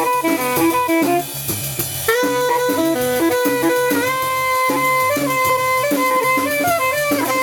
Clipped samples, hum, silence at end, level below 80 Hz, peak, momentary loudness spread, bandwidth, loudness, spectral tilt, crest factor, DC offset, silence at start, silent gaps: under 0.1%; none; 0 s; -52 dBFS; -2 dBFS; 3 LU; 17.5 kHz; -17 LUFS; -3.5 dB/octave; 16 dB; under 0.1%; 0 s; none